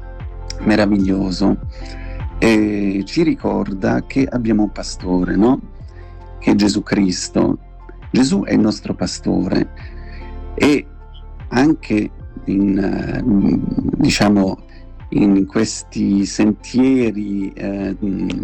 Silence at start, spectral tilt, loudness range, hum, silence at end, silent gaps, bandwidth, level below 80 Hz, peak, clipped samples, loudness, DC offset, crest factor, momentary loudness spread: 0 s; -6 dB/octave; 3 LU; none; 0 s; none; 10 kHz; -32 dBFS; -4 dBFS; under 0.1%; -17 LUFS; under 0.1%; 12 dB; 16 LU